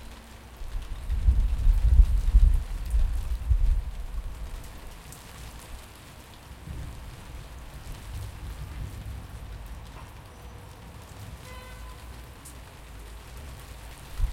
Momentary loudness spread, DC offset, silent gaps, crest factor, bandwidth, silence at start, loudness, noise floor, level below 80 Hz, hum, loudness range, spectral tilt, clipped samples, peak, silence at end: 21 LU; under 0.1%; none; 24 dB; 15 kHz; 0 s; -30 LUFS; -46 dBFS; -28 dBFS; none; 17 LU; -5.5 dB/octave; under 0.1%; -4 dBFS; 0 s